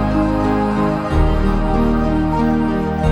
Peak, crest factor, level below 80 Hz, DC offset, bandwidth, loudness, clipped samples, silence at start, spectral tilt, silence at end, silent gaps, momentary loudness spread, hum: -2 dBFS; 12 dB; -22 dBFS; under 0.1%; 10.5 kHz; -17 LUFS; under 0.1%; 0 s; -8.5 dB/octave; 0 s; none; 1 LU; none